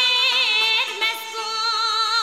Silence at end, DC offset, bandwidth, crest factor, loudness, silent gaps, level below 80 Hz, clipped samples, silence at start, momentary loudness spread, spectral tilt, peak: 0 s; 0.1%; 16 kHz; 14 dB; -18 LUFS; none; -80 dBFS; under 0.1%; 0 s; 7 LU; 3.5 dB/octave; -6 dBFS